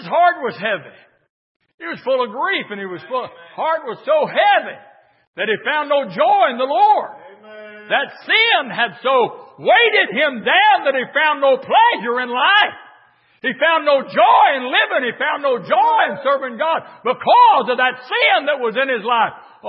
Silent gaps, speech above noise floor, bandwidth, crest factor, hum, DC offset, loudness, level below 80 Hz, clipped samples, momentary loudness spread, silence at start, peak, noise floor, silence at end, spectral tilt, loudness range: 1.30-1.60 s, 1.74-1.78 s, 5.27-5.33 s; 36 dB; 5.8 kHz; 16 dB; none; under 0.1%; -16 LUFS; -78 dBFS; under 0.1%; 12 LU; 0 s; -2 dBFS; -53 dBFS; 0 s; -8 dB/octave; 5 LU